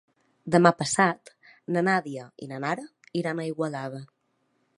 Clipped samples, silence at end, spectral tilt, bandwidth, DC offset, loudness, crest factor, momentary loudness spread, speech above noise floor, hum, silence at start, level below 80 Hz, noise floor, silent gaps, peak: under 0.1%; 0.7 s; -5 dB/octave; 11.5 kHz; under 0.1%; -26 LUFS; 26 dB; 19 LU; 47 dB; none; 0.45 s; -70 dBFS; -72 dBFS; none; -2 dBFS